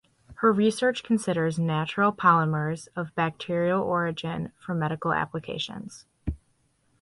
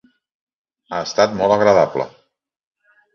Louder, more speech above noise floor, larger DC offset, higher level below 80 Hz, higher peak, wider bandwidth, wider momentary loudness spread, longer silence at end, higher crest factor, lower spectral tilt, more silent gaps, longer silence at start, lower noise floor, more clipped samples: second, -26 LUFS vs -17 LUFS; second, 42 dB vs 49 dB; neither; first, -50 dBFS vs -56 dBFS; second, -6 dBFS vs 0 dBFS; first, 11.5 kHz vs 7.2 kHz; about the same, 14 LU vs 14 LU; second, 0.65 s vs 1.05 s; about the same, 20 dB vs 18 dB; first, -6 dB/octave vs -4.5 dB/octave; neither; second, 0.3 s vs 0.9 s; about the same, -68 dBFS vs -65 dBFS; neither